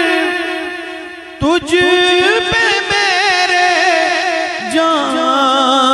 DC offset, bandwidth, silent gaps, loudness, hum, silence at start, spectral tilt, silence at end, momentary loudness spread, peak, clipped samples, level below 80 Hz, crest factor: under 0.1%; 12.5 kHz; none; -12 LUFS; none; 0 s; -2.5 dB/octave; 0 s; 10 LU; 0 dBFS; under 0.1%; -44 dBFS; 12 dB